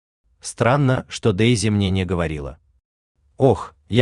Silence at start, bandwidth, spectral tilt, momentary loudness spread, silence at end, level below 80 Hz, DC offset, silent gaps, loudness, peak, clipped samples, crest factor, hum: 0.45 s; 11 kHz; -6 dB/octave; 14 LU; 0 s; -44 dBFS; under 0.1%; 2.85-3.15 s; -20 LUFS; -2 dBFS; under 0.1%; 18 dB; none